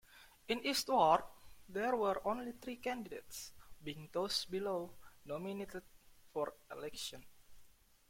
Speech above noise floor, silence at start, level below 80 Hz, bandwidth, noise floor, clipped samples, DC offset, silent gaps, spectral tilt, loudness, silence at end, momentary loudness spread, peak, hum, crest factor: 25 dB; 0.1 s; -68 dBFS; 16.5 kHz; -63 dBFS; under 0.1%; under 0.1%; none; -3.5 dB/octave; -39 LUFS; 0.4 s; 19 LU; -18 dBFS; none; 22 dB